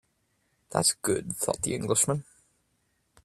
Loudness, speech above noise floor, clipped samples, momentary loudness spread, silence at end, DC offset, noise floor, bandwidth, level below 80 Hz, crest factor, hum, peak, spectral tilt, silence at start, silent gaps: -27 LUFS; 45 dB; under 0.1%; 6 LU; 1 s; under 0.1%; -73 dBFS; 15.5 kHz; -62 dBFS; 24 dB; none; -6 dBFS; -3.5 dB/octave; 0.7 s; none